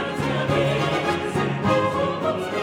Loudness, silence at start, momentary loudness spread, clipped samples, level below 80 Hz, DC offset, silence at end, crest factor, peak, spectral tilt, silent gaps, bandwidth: -22 LUFS; 0 s; 4 LU; under 0.1%; -48 dBFS; under 0.1%; 0 s; 14 dB; -8 dBFS; -6 dB/octave; none; 15 kHz